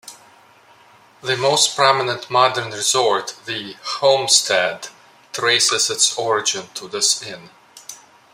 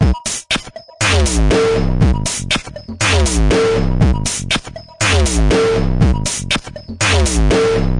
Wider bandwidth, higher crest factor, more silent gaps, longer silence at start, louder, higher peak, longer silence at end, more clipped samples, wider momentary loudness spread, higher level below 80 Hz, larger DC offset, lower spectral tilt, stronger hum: first, 16 kHz vs 11.5 kHz; first, 20 dB vs 14 dB; neither; about the same, 0.05 s vs 0 s; about the same, -17 LUFS vs -15 LUFS; about the same, 0 dBFS vs -2 dBFS; first, 0.4 s vs 0 s; neither; first, 19 LU vs 6 LU; second, -70 dBFS vs -20 dBFS; neither; second, -1 dB/octave vs -4.5 dB/octave; neither